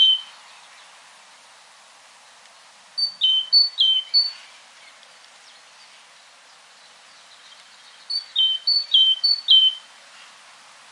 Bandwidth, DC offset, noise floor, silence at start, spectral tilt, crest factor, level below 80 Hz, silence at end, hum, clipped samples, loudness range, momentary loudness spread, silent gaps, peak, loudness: 11.5 kHz; under 0.1%; -50 dBFS; 0 s; 3.5 dB/octave; 20 dB; under -90 dBFS; 1.1 s; none; under 0.1%; 10 LU; 14 LU; none; -4 dBFS; -16 LUFS